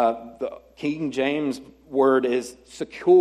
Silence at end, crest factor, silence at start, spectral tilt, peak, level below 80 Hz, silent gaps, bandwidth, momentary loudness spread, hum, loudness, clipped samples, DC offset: 0 s; 16 dB; 0 s; -5.5 dB/octave; -6 dBFS; -62 dBFS; none; 11.5 kHz; 15 LU; none; -24 LUFS; under 0.1%; under 0.1%